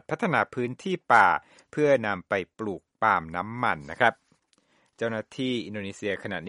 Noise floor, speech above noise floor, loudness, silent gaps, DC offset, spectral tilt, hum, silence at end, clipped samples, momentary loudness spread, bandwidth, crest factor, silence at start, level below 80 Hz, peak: -67 dBFS; 40 dB; -26 LUFS; none; under 0.1%; -5.5 dB/octave; none; 0 s; under 0.1%; 12 LU; 11.5 kHz; 22 dB; 0.1 s; -64 dBFS; -4 dBFS